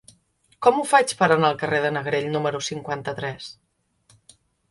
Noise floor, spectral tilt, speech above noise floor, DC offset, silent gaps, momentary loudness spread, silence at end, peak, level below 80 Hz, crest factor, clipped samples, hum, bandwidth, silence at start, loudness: -63 dBFS; -4.5 dB/octave; 41 dB; under 0.1%; none; 12 LU; 1.2 s; -2 dBFS; -62 dBFS; 22 dB; under 0.1%; none; 11.5 kHz; 0.6 s; -22 LUFS